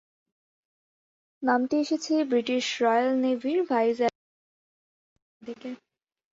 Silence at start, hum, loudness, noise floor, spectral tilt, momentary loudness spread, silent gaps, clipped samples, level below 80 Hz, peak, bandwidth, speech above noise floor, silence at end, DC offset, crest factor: 1.4 s; none; -26 LUFS; under -90 dBFS; -3.5 dB/octave; 16 LU; 4.15-5.16 s, 5.22-5.40 s; under 0.1%; -76 dBFS; -10 dBFS; 7.8 kHz; over 65 dB; 0.55 s; under 0.1%; 18 dB